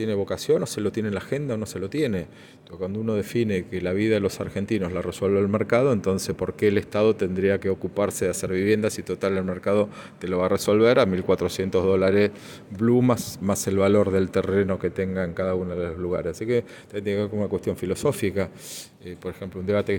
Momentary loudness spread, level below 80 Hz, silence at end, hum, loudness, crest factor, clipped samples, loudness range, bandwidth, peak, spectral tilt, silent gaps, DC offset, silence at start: 11 LU; -54 dBFS; 0 s; none; -24 LUFS; 18 dB; under 0.1%; 5 LU; 17 kHz; -6 dBFS; -6 dB/octave; none; under 0.1%; 0 s